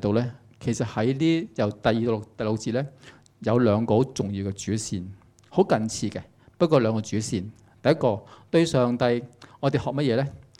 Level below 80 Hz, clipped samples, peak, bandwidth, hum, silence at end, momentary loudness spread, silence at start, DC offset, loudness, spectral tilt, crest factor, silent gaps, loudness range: -56 dBFS; under 0.1%; -6 dBFS; 12.5 kHz; none; 0.2 s; 11 LU; 0 s; under 0.1%; -25 LUFS; -6 dB/octave; 18 dB; none; 2 LU